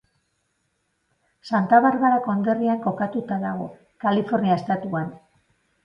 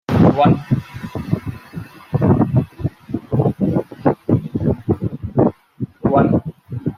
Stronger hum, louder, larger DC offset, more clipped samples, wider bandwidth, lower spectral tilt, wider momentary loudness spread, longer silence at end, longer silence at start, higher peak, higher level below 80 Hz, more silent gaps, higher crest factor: neither; second, -22 LUFS vs -18 LUFS; neither; neither; second, 7.2 kHz vs 13 kHz; second, -8.5 dB/octave vs -10 dB/octave; second, 12 LU vs 15 LU; first, 0.65 s vs 0 s; first, 1.45 s vs 0.1 s; about the same, -4 dBFS vs -2 dBFS; second, -66 dBFS vs -42 dBFS; neither; about the same, 20 dB vs 16 dB